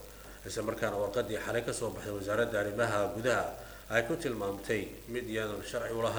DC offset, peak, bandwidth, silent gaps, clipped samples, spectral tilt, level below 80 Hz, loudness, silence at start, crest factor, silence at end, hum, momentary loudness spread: under 0.1%; -12 dBFS; over 20 kHz; none; under 0.1%; -4.5 dB/octave; -54 dBFS; -34 LUFS; 0 s; 22 dB; 0 s; none; 8 LU